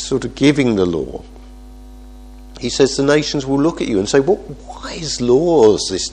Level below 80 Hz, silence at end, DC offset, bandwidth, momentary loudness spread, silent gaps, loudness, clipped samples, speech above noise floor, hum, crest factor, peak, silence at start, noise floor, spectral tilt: -38 dBFS; 0 s; under 0.1%; 10.5 kHz; 15 LU; none; -16 LUFS; under 0.1%; 21 dB; none; 16 dB; 0 dBFS; 0 s; -36 dBFS; -5 dB/octave